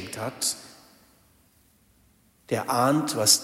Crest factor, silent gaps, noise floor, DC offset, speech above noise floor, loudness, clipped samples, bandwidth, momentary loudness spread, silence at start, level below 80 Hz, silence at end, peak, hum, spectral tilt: 24 dB; none; -62 dBFS; under 0.1%; 38 dB; -25 LUFS; under 0.1%; 16 kHz; 12 LU; 0 s; -68 dBFS; 0 s; -4 dBFS; none; -2.5 dB/octave